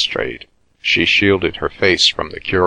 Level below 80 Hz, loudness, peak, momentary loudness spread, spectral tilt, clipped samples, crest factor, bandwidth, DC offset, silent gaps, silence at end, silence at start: -42 dBFS; -15 LUFS; 0 dBFS; 12 LU; -3.5 dB/octave; under 0.1%; 16 dB; 10.5 kHz; under 0.1%; none; 0 s; 0 s